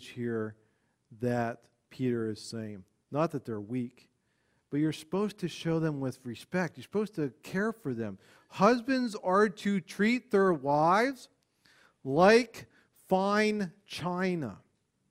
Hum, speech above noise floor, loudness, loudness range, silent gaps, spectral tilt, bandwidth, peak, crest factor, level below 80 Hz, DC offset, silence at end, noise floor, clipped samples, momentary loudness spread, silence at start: none; 44 dB; -30 LUFS; 8 LU; none; -6 dB/octave; 15.5 kHz; -10 dBFS; 22 dB; -68 dBFS; under 0.1%; 0.5 s; -74 dBFS; under 0.1%; 15 LU; 0 s